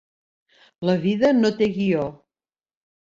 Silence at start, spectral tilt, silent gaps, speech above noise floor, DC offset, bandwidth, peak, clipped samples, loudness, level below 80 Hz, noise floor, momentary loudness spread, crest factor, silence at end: 0.8 s; -7 dB/octave; none; over 70 dB; under 0.1%; 7.6 kHz; -6 dBFS; under 0.1%; -21 LUFS; -60 dBFS; under -90 dBFS; 8 LU; 18 dB; 1 s